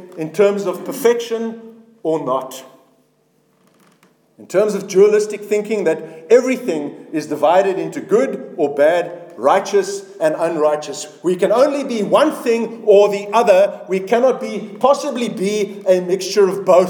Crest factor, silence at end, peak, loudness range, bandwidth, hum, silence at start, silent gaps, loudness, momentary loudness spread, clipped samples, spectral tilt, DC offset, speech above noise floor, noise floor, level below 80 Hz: 16 dB; 0 s; 0 dBFS; 7 LU; 19 kHz; none; 0 s; none; -17 LUFS; 11 LU; under 0.1%; -5 dB/octave; under 0.1%; 43 dB; -59 dBFS; -72 dBFS